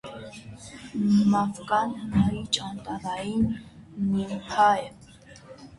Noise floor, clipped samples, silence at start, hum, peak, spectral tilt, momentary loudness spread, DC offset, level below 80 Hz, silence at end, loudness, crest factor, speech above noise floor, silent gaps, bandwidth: -49 dBFS; under 0.1%; 0.05 s; none; -8 dBFS; -5.5 dB/octave; 21 LU; under 0.1%; -50 dBFS; 0.05 s; -26 LUFS; 18 dB; 24 dB; none; 11.5 kHz